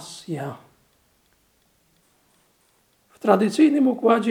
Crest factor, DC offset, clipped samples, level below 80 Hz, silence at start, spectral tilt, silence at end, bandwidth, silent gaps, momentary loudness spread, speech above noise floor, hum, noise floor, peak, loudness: 22 dB; under 0.1%; under 0.1%; -74 dBFS; 0 s; -6 dB/octave; 0 s; 14 kHz; none; 16 LU; 45 dB; none; -64 dBFS; -2 dBFS; -20 LUFS